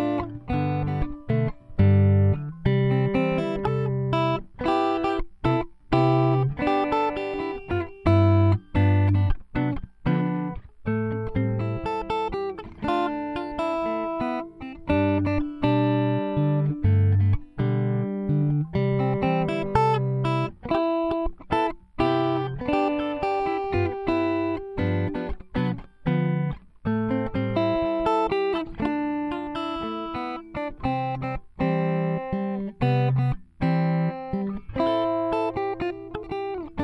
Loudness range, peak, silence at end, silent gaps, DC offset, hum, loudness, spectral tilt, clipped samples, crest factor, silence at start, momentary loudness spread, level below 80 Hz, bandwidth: 5 LU; -8 dBFS; 0 s; none; under 0.1%; none; -25 LUFS; -9 dB/octave; under 0.1%; 16 dB; 0 s; 9 LU; -40 dBFS; 7.6 kHz